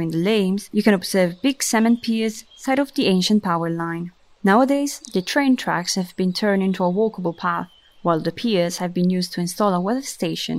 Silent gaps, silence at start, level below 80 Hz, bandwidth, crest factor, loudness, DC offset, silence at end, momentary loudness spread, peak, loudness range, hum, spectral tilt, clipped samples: none; 0 s; -60 dBFS; 16 kHz; 18 dB; -21 LUFS; under 0.1%; 0 s; 7 LU; -2 dBFS; 2 LU; none; -5 dB/octave; under 0.1%